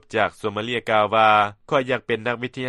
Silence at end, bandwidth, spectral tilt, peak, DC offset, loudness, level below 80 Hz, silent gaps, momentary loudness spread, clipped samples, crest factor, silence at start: 0 s; 12 kHz; -5.5 dB/octave; -4 dBFS; under 0.1%; -21 LUFS; -58 dBFS; none; 10 LU; under 0.1%; 18 dB; 0.1 s